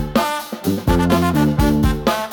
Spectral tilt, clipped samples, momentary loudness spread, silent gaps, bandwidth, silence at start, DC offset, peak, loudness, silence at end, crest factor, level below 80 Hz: -6 dB/octave; under 0.1%; 7 LU; none; 19 kHz; 0 s; under 0.1%; -4 dBFS; -17 LUFS; 0 s; 12 dB; -26 dBFS